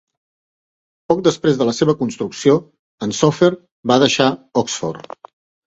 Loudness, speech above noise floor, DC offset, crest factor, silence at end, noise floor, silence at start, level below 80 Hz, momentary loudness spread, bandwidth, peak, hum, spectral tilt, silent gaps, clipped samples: -17 LUFS; over 74 dB; under 0.1%; 18 dB; 0.7 s; under -90 dBFS; 1.1 s; -56 dBFS; 12 LU; 8.2 kHz; 0 dBFS; none; -5 dB/octave; 2.79-2.98 s, 3.72-3.83 s; under 0.1%